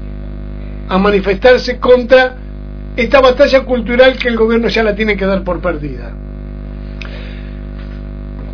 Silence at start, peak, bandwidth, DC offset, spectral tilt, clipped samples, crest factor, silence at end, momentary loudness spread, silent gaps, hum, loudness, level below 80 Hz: 0 s; 0 dBFS; 5.4 kHz; under 0.1%; -6.5 dB/octave; 0.9%; 14 dB; 0 s; 19 LU; none; 50 Hz at -25 dBFS; -11 LUFS; -26 dBFS